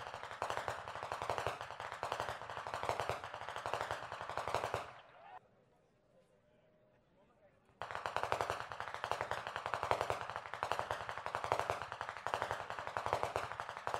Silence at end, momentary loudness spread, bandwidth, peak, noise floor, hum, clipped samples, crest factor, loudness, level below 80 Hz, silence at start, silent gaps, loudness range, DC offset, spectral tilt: 0 s; 7 LU; 16 kHz; -14 dBFS; -72 dBFS; none; under 0.1%; 28 dB; -42 LUFS; -66 dBFS; 0 s; none; 7 LU; under 0.1%; -3.5 dB/octave